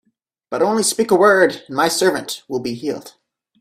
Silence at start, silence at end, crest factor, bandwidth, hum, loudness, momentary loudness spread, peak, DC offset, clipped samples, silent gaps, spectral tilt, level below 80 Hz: 0.5 s; 0.5 s; 18 dB; 16 kHz; none; -17 LUFS; 13 LU; 0 dBFS; under 0.1%; under 0.1%; none; -3 dB/octave; -62 dBFS